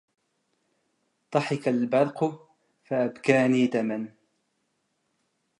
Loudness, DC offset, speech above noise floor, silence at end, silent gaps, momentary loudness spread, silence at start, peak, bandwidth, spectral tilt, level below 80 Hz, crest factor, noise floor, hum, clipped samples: -26 LUFS; under 0.1%; 51 dB; 1.5 s; none; 9 LU; 1.3 s; -6 dBFS; 10.5 kHz; -6.5 dB/octave; -80 dBFS; 22 dB; -75 dBFS; none; under 0.1%